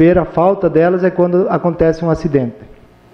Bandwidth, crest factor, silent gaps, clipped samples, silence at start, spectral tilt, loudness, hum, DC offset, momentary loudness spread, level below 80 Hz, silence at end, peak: 6.8 kHz; 12 dB; none; under 0.1%; 0 s; -9.5 dB/octave; -14 LUFS; none; under 0.1%; 4 LU; -36 dBFS; 0.45 s; -2 dBFS